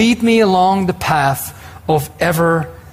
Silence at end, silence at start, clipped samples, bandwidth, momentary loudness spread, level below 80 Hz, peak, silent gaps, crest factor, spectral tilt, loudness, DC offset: 0.15 s; 0 s; under 0.1%; 16 kHz; 9 LU; -42 dBFS; -4 dBFS; none; 12 dB; -5.5 dB/octave; -15 LUFS; under 0.1%